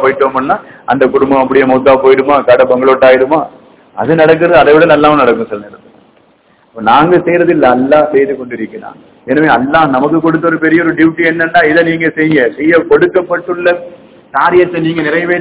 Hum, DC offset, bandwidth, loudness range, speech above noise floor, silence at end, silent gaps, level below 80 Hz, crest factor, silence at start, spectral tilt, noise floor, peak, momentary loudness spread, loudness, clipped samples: none; under 0.1%; 4 kHz; 3 LU; 40 dB; 0 s; none; -44 dBFS; 10 dB; 0 s; -10 dB/octave; -48 dBFS; 0 dBFS; 10 LU; -9 LUFS; 4%